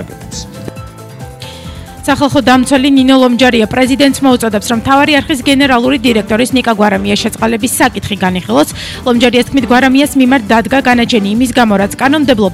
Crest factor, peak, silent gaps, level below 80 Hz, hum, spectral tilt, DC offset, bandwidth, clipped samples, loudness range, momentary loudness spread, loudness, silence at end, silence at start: 10 dB; 0 dBFS; none; -34 dBFS; none; -4.5 dB/octave; under 0.1%; 15.5 kHz; 0.2%; 3 LU; 17 LU; -10 LUFS; 0 s; 0 s